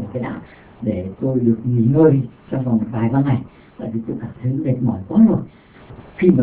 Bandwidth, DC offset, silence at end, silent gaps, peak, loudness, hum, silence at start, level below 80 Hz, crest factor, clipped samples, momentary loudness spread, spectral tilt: 4 kHz; under 0.1%; 0 s; none; 0 dBFS; -19 LUFS; none; 0 s; -46 dBFS; 18 dB; under 0.1%; 14 LU; -13.5 dB/octave